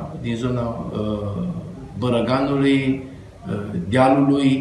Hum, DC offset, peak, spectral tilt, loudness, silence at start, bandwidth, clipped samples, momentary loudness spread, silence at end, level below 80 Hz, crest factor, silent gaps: none; under 0.1%; -2 dBFS; -7.5 dB/octave; -21 LUFS; 0 s; 10.5 kHz; under 0.1%; 13 LU; 0 s; -44 dBFS; 20 dB; none